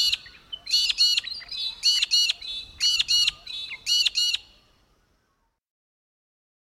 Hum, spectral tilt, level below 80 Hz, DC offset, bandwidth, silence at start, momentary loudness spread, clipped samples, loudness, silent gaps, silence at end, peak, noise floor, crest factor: none; 3.5 dB/octave; -60 dBFS; under 0.1%; 15.5 kHz; 0 s; 14 LU; under 0.1%; -22 LUFS; none; 2.3 s; -10 dBFS; -72 dBFS; 18 dB